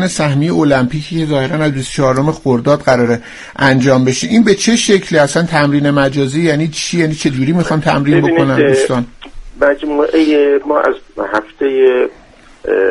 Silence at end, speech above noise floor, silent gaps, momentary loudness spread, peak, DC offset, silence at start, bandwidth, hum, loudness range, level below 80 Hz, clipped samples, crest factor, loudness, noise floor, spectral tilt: 0 s; 23 dB; none; 6 LU; 0 dBFS; under 0.1%; 0 s; 11.5 kHz; none; 2 LU; -40 dBFS; under 0.1%; 12 dB; -12 LUFS; -35 dBFS; -5.5 dB/octave